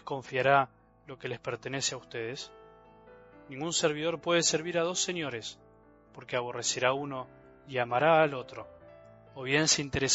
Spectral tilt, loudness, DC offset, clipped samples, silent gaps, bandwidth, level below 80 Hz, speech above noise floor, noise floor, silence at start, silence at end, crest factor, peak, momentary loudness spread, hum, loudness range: -3 dB/octave; -29 LUFS; under 0.1%; under 0.1%; none; 8.2 kHz; -64 dBFS; 29 dB; -59 dBFS; 0.05 s; 0 s; 22 dB; -10 dBFS; 20 LU; none; 5 LU